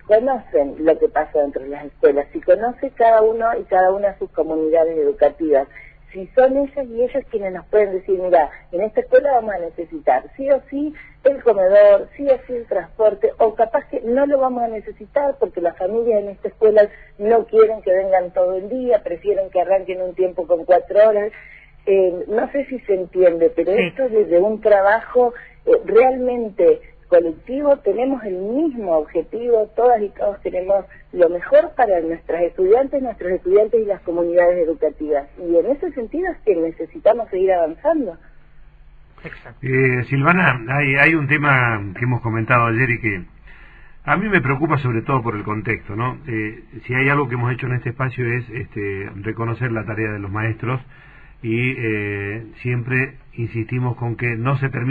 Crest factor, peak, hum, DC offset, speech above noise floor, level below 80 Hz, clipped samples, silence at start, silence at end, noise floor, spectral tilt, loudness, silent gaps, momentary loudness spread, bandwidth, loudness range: 18 dB; 0 dBFS; none; under 0.1%; 27 dB; -46 dBFS; under 0.1%; 0.1 s; 0 s; -45 dBFS; -9.5 dB/octave; -18 LUFS; none; 10 LU; 4.7 kHz; 6 LU